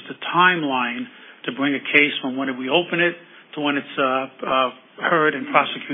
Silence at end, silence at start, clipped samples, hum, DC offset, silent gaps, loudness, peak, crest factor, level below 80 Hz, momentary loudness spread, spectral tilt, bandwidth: 0 s; 0 s; under 0.1%; none; under 0.1%; none; -20 LUFS; 0 dBFS; 22 dB; -72 dBFS; 12 LU; -8 dB/octave; 3.9 kHz